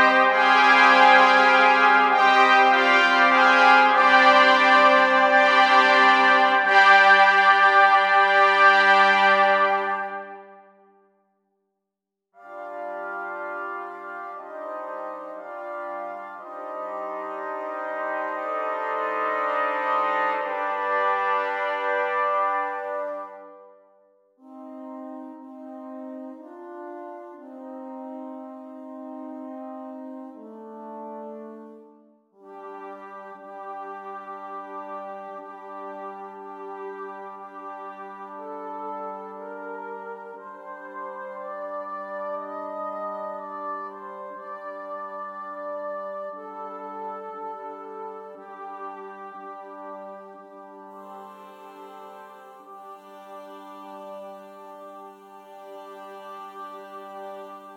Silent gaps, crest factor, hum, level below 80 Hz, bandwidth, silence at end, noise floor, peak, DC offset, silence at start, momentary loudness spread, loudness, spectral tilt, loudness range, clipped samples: none; 22 dB; none; -86 dBFS; 10 kHz; 0 s; -84 dBFS; -2 dBFS; under 0.1%; 0 s; 25 LU; -18 LUFS; -2.5 dB/octave; 25 LU; under 0.1%